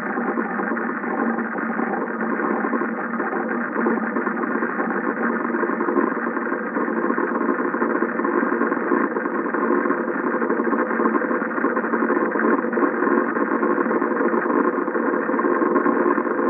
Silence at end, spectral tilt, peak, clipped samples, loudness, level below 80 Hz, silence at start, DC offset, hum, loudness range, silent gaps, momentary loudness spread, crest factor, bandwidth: 0 s; -12 dB/octave; -4 dBFS; under 0.1%; -22 LUFS; -86 dBFS; 0 s; under 0.1%; none; 3 LU; none; 4 LU; 16 dB; 3.2 kHz